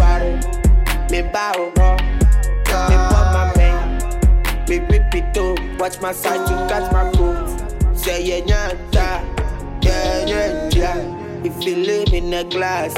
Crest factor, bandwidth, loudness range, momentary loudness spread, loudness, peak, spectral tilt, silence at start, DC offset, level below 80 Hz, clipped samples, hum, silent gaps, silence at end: 14 dB; 16 kHz; 4 LU; 7 LU; -18 LUFS; -2 dBFS; -5.5 dB/octave; 0 s; under 0.1%; -18 dBFS; under 0.1%; none; none; 0 s